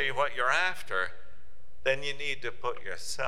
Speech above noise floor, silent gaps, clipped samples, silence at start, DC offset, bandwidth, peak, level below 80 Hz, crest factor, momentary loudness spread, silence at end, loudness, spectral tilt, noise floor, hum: 27 dB; none; under 0.1%; 0 s; 3%; 16 kHz; -12 dBFS; -60 dBFS; 20 dB; 10 LU; 0 s; -31 LUFS; -2 dB/octave; -58 dBFS; none